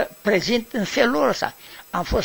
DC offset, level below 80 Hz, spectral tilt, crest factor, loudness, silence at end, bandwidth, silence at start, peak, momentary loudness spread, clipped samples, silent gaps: under 0.1%; -38 dBFS; -4.5 dB/octave; 20 dB; -22 LUFS; 0 s; over 20 kHz; 0 s; -2 dBFS; 10 LU; under 0.1%; none